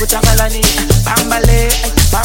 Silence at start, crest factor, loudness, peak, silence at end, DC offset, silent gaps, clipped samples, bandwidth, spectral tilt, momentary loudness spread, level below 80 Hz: 0 s; 10 dB; -11 LUFS; 0 dBFS; 0 s; under 0.1%; none; under 0.1%; 17.5 kHz; -3.5 dB/octave; 2 LU; -14 dBFS